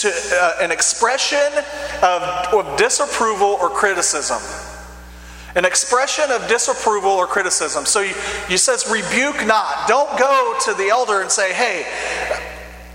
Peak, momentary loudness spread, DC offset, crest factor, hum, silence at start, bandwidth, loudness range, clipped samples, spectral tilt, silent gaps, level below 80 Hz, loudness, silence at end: 0 dBFS; 8 LU; under 0.1%; 18 dB; 60 Hz at -45 dBFS; 0 s; 16.5 kHz; 2 LU; under 0.1%; -1 dB/octave; none; -44 dBFS; -17 LUFS; 0 s